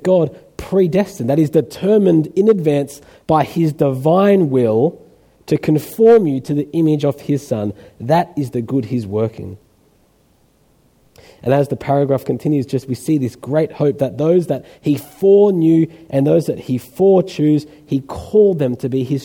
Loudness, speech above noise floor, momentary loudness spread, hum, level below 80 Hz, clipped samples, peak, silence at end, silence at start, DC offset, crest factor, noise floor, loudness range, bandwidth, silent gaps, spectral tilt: -16 LUFS; 40 dB; 10 LU; none; -50 dBFS; under 0.1%; -2 dBFS; 0 s; 0 s; under 0.1%; 14 dB; -56 dBFS; 7 LU; 18 kHz; none; -8 dB/octave